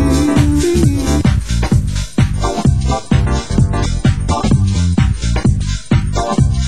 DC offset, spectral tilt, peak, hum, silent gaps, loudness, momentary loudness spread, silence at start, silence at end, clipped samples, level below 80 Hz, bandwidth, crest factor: 3%; -6.5 dB/octave; 0 dBFS; none; none; -15 LUFS; 4 LU; 0 s; 0 s; under 0.1%; -18 dBFS; 16 kHz; 14 dB